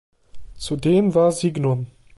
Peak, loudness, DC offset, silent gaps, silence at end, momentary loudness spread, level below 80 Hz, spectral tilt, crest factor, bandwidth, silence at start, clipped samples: -6 dBFS; -20 LUFS; under 0.1%; none; 0.3 s; 11 LU; -48 dBFS; -7 dB/octave; 14 dB; 11.5 kHz; 0.35 s; under 0.1%